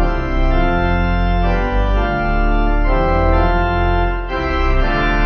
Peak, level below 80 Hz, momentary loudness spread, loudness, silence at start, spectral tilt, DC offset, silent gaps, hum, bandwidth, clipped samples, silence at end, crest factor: -2 dBFS; -16 dBFS; 4 LU; -17 LUFS; 0 s; -8 dB/octave; under 0.1%; none; none; 6 kHz; under 0.1%; 0 s; 12 dB